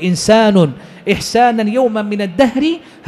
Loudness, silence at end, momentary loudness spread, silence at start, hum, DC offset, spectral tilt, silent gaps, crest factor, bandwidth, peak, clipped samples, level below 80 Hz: -13 LUFS; 0 s; 8 LU; 0 s; none; under 0.1%; -5.5 dB/octave; none; 12 dB; 13 kHz; -2 dBFS; under 0.1%; -44 dBFS